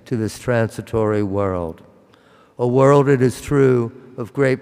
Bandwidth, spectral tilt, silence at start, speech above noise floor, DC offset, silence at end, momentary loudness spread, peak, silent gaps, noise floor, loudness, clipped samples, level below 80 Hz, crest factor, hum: 15.5 kHz; -7.5 dB/octave; 0.1 s; 33 dB; under 0.1%; 0 s; 14 LU; -4 dBFS; none; -51 dBFS; -18 LUFS; under 0.1%; -48 dBFS; 14 dB; none